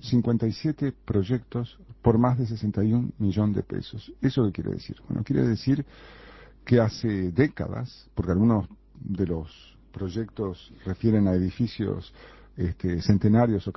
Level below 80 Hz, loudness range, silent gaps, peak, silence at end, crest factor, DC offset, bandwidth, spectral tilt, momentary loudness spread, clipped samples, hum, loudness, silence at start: -44 dBFS; 3 LU; none; -6 dBFS; 0.05 s; 20 dB; under 0.1%; 6 kHz; -9 dB/octave; 14 LU; under 0.1%; none; -26 LUFS; 0.05 s